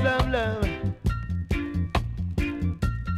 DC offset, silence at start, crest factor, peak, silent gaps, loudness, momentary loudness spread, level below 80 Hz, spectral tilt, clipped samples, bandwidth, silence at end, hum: under 0.1%; 0 s; 16 dB; -10 dBFS; none; -28 LUFS; 5 LU; -32 dBFS; -7 dB/octave; under 0.1%; 13.5 kHz; 0 s; none